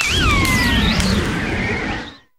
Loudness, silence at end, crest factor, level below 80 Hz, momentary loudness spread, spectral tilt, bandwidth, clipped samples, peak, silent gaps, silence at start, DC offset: -17 LUFS; 0.2 s; 18 dB; -26 dBFS; 8 LU; -4 dB/octave; 17.5 kHz; under 0.1%; 0 dBFS; none; 0 s; under 0.1%